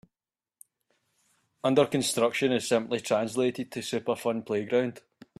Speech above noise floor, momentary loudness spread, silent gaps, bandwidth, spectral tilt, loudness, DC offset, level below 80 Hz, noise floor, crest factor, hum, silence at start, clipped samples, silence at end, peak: over 63 dB; 7 LU; none; 14.5 kHz; -4.5 dB/octave; -28 LUFS; under 0.1%; -72 dBFS; under -90 dBFS; 20 dB; none; 1.65 s; under 0.1%; 0.4 s; -10 dBFS